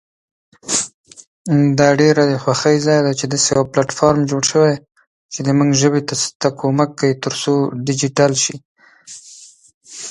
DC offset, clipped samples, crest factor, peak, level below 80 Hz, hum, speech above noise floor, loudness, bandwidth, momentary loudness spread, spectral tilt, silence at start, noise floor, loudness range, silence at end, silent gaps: under 0.1%; under 0.1%; 16 dB; 0 dBFS; -54 dBFS; none; 27 dB; -16 LUFS; 11.5 kHz; 18 LU; -4.5 dB/octave; 0.65 s; -42 dBFS; 4 LU; 0 s; 0.94-1.04 s, 1.27-1.45 s, 5.07-5.29 s, 6.35-6.40 s, 8.65-8.75 s, 9.74-9.81 s